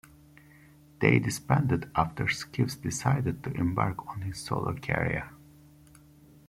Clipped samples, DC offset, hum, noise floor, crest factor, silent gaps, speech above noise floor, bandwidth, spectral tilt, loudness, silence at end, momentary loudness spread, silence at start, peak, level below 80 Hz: under 0.1%; under 0.1%; none; -56 dBFS; 24 dB; none; 27 dB; 15.5 kHz; -6 dB/octave; -29 LUFS; 1.1 s; 9 LU; 1 s; -6 dBFS; -54 dBFS